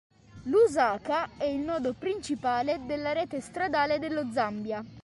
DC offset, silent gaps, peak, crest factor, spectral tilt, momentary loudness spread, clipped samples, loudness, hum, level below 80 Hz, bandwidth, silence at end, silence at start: under 0.1%; none; -12 dBFS; 16 dB; -5 dB/octave; 9 LU; under 0.1%; -29 LUFS; none; -60 dBFS; 11.5 kHz; 0.05 s; 0.35 s